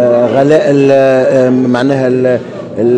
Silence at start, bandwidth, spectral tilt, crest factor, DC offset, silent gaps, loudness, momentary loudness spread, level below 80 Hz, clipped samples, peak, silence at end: 0 s; 10 kHz; -7.5 dB/octave; 8 dB; under 0.1%; none; -9 LUFS; 6 LU; -54 dBFS; 0.3%; 0 dBFS; 0 s